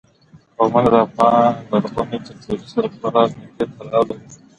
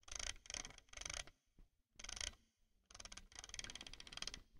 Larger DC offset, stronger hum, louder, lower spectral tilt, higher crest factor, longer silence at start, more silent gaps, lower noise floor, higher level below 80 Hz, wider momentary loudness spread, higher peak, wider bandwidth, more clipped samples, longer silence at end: neither; neither; first, -18 LUFS vs -50 LUFS; first, -7.5 dB/octave vs 0 dB/octave; second, 18 dB vs 28 dB; first, 0.6 s vs 0.05 s; neither; second, -50 dBFS vs -79 dBFS; first, -50 dBFS vs -62 dBFS; first, 13 LU vs 10 LU; first, 0 dBFS vs -26 dBFS; second, 10.5 kHz vs 16 kHz; neither; first, 0.25 s vs 0 s